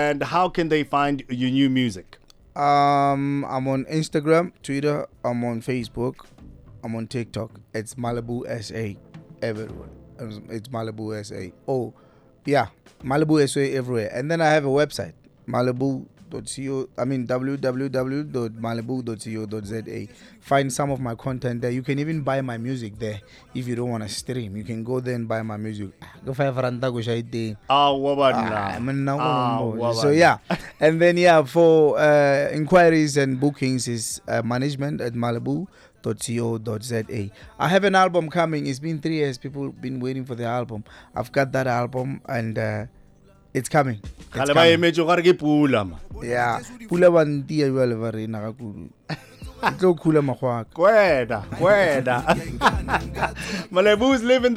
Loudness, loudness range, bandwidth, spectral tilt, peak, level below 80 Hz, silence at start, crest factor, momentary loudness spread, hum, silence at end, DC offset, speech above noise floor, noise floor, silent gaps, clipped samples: -22 LUFS; 10 LU; 15 kHz; -5.5 dB/octave; -6 dBFS; -48 dBFS; 0 s; 16 dB; 16 LU; none; 0 s; under 0.1%; 31 dB; -53 dBFS; none; under 0.1%